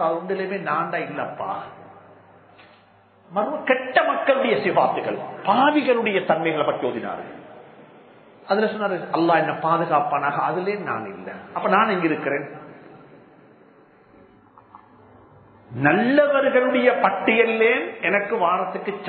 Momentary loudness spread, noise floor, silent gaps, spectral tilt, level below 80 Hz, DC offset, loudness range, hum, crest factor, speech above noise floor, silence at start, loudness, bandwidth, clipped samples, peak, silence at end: 12 LU; -54 dBFS; none; -10 dB/octave; -70 dBFS; under 0.1%; 9 LU; none; 20 dB; 33 dB; 0 s; -21 LUFS; 4.5 kHz; under 0.1%; -2 dBFS; 0 s